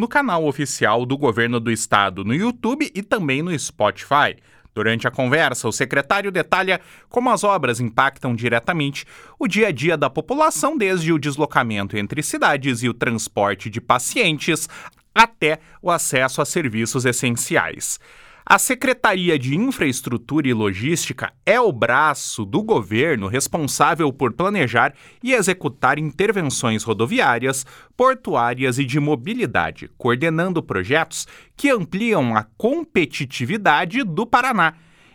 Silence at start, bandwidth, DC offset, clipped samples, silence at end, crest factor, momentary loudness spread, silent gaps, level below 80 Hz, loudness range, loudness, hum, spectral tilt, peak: 0 s; over 20 kHz; under 0.1%; under 0.1%; 0.4 s; 20 dB; 6 LU; none; -54 dBFS; 2 LU; -19 LUFS; none; -4 dB/octave; 0 dBFS